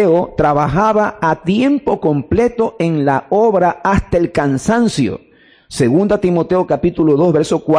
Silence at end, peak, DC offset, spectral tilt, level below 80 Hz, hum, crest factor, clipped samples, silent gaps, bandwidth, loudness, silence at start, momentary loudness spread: 0 s; -4 dBFS; under 0.1%; -7 dB/octave; -36 dBFS; none; 10 dB; under 0.1%; none; 10.5 kHz; -14 LUFS; 0 s; 4 LU